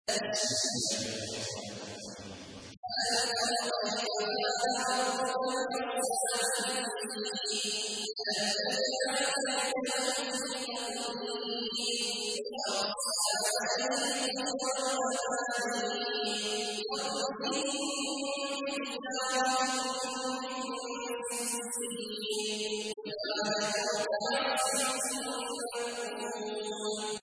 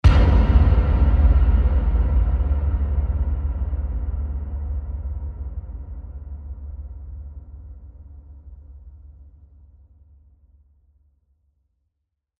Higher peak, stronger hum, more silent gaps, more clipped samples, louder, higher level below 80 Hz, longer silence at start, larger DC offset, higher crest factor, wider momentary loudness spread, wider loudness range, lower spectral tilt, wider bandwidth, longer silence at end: second, -16 dBFS vs -2 dBFS; neither; first, 2.77-2.83 s vs none; neither; second, -32 LUFS vs -21 LUFS; second, -74 dBFS vs -22 dBFS; about the same, 0.05 s vs 0.05 s; neither; about the same, 18 dB vs 20 dB; second, 7 LU vs 25 LU; second, 2 LU vs 23 LU; second, -1 dB/octave vs -9 dB/octave; first, 11 kHz vs 5 kHz; second, 0 s vs 3.15 s